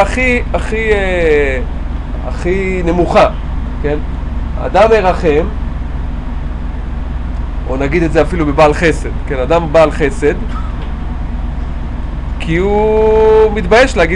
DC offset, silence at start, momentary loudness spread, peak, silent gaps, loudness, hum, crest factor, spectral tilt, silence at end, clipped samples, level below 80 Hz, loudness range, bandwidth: under 0.1%; 0 s; 13 LU; 0 dBFS; none; -14 LUFS; none; 12 dB; -6.5 dB/octave; 0 s; under 0.1%; -18 dBFS; 4 LU; 10.5 kHz